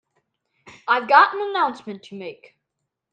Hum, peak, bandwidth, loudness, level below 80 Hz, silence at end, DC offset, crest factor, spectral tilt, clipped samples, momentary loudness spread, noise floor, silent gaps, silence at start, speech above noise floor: none; 0 dBFS; 8.8 kHz; -18 LUFS; -78 dBFS; 0.8 s; under 0.1%; 22 dB; -4.5 dB/octave; under 0.1%; 21 LU; -80 dBFS; none; 0.65 s; 60 dB